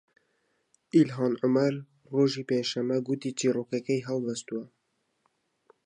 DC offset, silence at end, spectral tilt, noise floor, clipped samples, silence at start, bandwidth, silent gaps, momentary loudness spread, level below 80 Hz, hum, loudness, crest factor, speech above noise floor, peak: under 0.1%; 1.2 s; -6 dB/octave; -74 dBFS; under 0.1%; 0.95 s; 10 kHz; none; 9 LU; -80 dBFS; none; -28 LUFS; 20 dB; 47 dB; -10 dBFS